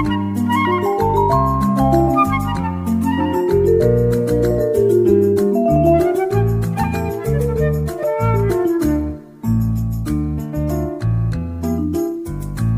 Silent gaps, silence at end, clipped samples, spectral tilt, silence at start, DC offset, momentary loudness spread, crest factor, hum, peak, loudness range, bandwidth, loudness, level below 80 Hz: none; 0 s; under 0.1%; -8 dB/octave; 0 s; under 0.1%; 8 LU; 14 dB; none; -2 dBFS; 5 LU; 16 kHz; -17 LUFS; -30 dBFS